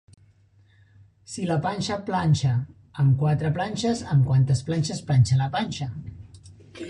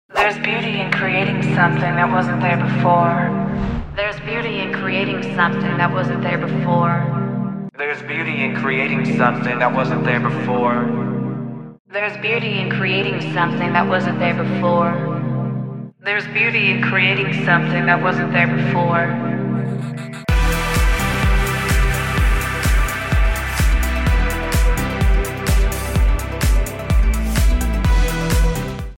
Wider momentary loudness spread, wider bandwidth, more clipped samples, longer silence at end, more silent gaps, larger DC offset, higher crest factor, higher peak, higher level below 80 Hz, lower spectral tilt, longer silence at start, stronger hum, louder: first, 12 LU vs 7 LU; second, 10.5 kHz vs 17 kHz; neither; about the same, 0 s vs 0.05 s; second, none vs 11.80-11.85 s; second, under 0.1% vs 0.3%; about the same, 16 dB vs 16 dB; second, -8 dBFS vs 0 dBFS; second, -48 dBFS vs -22 dBFS; about the same, -6.5 dB/octave vs -5.5 dB/octave; first, 1.3 s vs 0.1 s; neither; second, -24 LUFS vs -18 LUFS